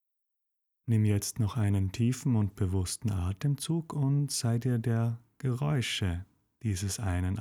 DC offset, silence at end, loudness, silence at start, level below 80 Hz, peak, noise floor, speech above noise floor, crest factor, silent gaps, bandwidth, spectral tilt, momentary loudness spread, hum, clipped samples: under 0.1%; 0 s; -31 LUFS; 0.85 s; -52 dBFS; -16 dBFS; -83 dBFS; 54 dB; 14 dB; none; 16 kHz; -5.5 dB/octave; 6 LU; none; under 0.1%